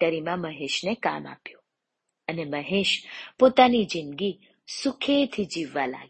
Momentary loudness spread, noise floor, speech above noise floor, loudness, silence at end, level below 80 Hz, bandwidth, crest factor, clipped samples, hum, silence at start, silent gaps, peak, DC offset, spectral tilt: 18 LU; -81 dBFS; 56 dB; -25 LUFS; 0.05 s; -64 dBFS; 8.8 kHz; 24 dB; under 0.1%; none; 0 s; none; -2 dBFS; under 0.1%; -4.5 dB/octave